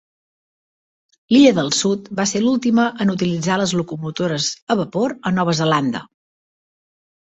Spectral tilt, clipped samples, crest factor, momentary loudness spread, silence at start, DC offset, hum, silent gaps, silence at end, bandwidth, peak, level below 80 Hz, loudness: -4.5 dB/octave; under 0.1%; 18 dB; 9 LU; 1.3 s; under 0.1%; none; 4.62-4.67 s; 1.15 s; 8.2 kHz; -2 dBFS; -58 dBFS; -18 LUFS